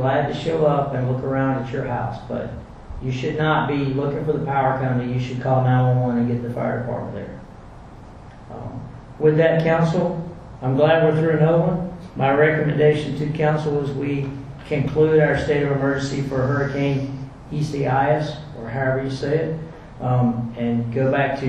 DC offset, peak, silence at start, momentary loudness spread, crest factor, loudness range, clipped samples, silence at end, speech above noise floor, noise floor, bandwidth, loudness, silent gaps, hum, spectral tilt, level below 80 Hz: under 0.1%; -4 dBFS; 0 s; 14 LU; 18 dB; 5 LU; under 0.1%; 0 s; 20 dB; -40 dBFS; 9 kHz; -21 LUFS; none; none; -8 dB/octave; -44 dBFS